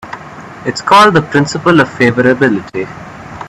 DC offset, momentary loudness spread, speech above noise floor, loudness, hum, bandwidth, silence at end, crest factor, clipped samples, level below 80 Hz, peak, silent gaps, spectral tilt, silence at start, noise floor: under 0.1%; 21 LU; 19 dB; -10 LUFS; none; 13.5 kHz; 0 s; 12 dB; under 0.1%; -46 dBFS; 0 dBFS; none; -5.5 dB/octave; 0.05 s; -30 dBFS